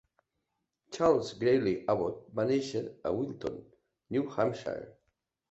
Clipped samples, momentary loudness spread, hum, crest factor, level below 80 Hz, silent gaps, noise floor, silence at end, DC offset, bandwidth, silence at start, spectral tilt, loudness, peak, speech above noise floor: under 0.1%; 13 LU; none; 20 dB; -64 dBFS; none; -83 dBFS; 0.6 s; under 0.1%; 8.2 kHz; 0.9 s; -6.5 dB/octave; -31 LUFS; -12 dBFS; 53 dB